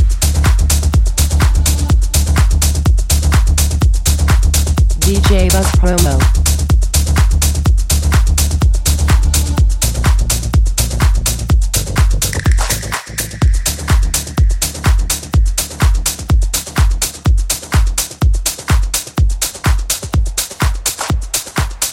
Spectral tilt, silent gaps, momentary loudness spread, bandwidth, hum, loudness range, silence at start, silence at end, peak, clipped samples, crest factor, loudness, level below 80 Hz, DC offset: -4 dB/octave; none; 4 LU; 17 kHz; none; 3 LU; 0 s; 0 s; 0 dBFS; under 0.1%; 12 dB; -14 LUFS; -14 dBFS; under 0.1%